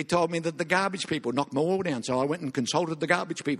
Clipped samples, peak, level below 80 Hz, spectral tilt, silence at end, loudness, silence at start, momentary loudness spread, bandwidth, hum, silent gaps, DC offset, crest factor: under 0.1%; -8 dBFS; -66 dBFS; -4.5 dB/octave; 0 s; -27 LUFS; 0 s; 3 LU; 12.5 kHz; none; none; under 0.1%; 20 dB